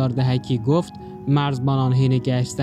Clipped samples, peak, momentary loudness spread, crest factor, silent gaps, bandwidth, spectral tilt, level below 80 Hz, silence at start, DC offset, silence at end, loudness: under 0.1%; -8 dBFS; 4 LU; 12 dB; none; 10 kHz; -7.5 dB/octave; -52 dBFS; 0 s; under 0.1%; 0 s; -20 LUFS